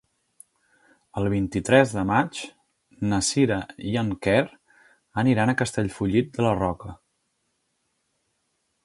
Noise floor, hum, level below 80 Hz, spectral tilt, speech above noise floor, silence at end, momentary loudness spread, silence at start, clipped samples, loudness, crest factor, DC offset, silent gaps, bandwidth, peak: -74 dBFS; none; -50 dBFS; -5.5 dB/octave; 51 dB; 1.9 s; 14 LU; 1.15 s; under 0.1%; -24 LUFS; 24 dB; under 0.1%; none; 11.5 kHz; -2 dBFS